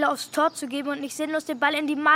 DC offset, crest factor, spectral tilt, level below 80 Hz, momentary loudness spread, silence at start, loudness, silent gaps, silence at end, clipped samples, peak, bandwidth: under 0.1%; 18 dB; -2 dB/octave; -76 dBFS; 7 LU; 0 s; -26 LUFS; none; 0 s; under 0.1%; -8 dBFS; 16 kHz